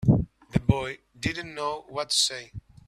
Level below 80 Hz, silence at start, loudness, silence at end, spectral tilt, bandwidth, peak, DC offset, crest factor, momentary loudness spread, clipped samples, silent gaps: -44 dBFS; 0 s; -27 LUFS; 0.3 s; -4.5 dB/octave; 14.5 kHz; -6 dBFS; under 0.1%; 22 dB; 12 LU; under 0.1%; none